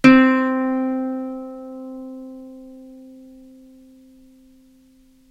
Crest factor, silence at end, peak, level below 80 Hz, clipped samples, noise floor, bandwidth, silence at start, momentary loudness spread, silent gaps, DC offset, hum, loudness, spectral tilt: 22 dB; 2.45 s; 0 dBFS; -54 dBFS; under 0.1%; -53 dBFS; 9.8 kHz; 0.05 s; 27 LU; none; under 0.1%; none; -19 LUFS; -6 dB/octave